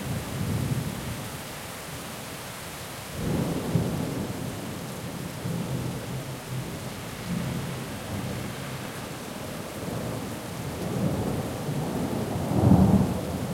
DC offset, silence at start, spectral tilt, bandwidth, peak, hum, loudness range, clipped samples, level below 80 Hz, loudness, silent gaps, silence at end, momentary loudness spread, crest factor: under 0.1%; 0 s; -6 dB/octave; 16.5 kHz; -6 dBFS; none; 8 LU; under 0.1%; -46 dBFS; -30 LUFS; none; 0 s; 10 LU; 24 dB